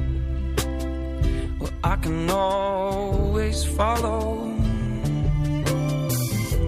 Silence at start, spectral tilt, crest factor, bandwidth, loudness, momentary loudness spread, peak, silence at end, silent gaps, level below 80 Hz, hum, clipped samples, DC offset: 0 s; -6 dB/octave; 16 dB; 15.5 kHz; -25 LUFS; 5 LU; -8 dBFS; 0 s; none; -28 dBFS; none; under 0.1%; under 0.1%